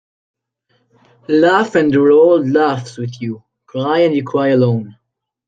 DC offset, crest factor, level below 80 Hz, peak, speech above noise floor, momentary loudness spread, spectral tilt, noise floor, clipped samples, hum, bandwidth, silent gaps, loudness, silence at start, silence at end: under 0.1%; 14 dB; -60 dBFS; -2 dBFS; 50 dB; 16 LU; -7.5 dB/octave; -63 dBFS; under 0.1%; none; 9 kHz; none; -14 LUFS; 1.3 s; 0.55 s